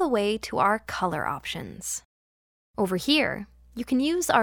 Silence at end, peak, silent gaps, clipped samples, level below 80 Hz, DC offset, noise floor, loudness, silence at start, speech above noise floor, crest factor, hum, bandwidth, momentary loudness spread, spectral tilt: 0 s; -6 dBFS; 2.05-2.74 s; under 0.1%; -54 dBFS; under 0.1%; under -90 dBFS; -26 LUFS; 0 s; over 64 dB; 22 dB; none; 19.5 kHz; 13 LU; -3.5 dB/octave